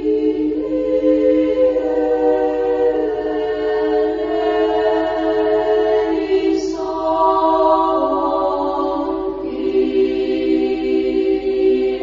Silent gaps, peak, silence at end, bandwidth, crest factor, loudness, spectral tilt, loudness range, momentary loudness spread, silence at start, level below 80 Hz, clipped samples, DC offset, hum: none; -2 dBFS; 0 s; 7.4 kHz; 14 dB; -17 LUFS; -6 dB/octave; 2 LU; 5 LU; 0 s; -44 dBFS; under 0.1%; under 0.1%; none